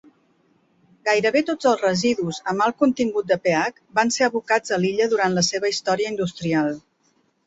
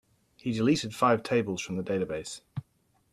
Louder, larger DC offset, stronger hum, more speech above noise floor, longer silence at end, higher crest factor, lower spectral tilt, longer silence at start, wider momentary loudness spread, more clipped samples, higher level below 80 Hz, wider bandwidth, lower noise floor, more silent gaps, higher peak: first, -21 LUFS vs -29 LUFS; neither; neither; about the same, 44 dB vs 42 dB; first, 0.65 s vs 0.5 s; about the same, 18 dB vs 18 dB; second, -4 dB/octave vs -5.5 dB/octave; first, 1.05 s vs 0.45 s; second, 6 LU vs 14 LU; neither; about the same, -62 dBFS vs -64 dBFS; second, 8.4 kHz vs 14.5 kHz; second, -65 dBFS vs -70 dBFS; neither; first, -4 dBFS vs -12 dBFS